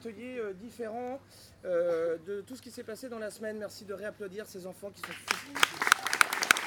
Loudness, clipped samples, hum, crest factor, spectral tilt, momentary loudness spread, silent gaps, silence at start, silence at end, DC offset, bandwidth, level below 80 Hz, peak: -32 LUFS; under 0.1%; none; 32 dB; -1.5 dB/octave; 17 LU; none; 0 s; 0 s; under 0.1%; 19.5 kHz; -72 dBFS; 0 dBFS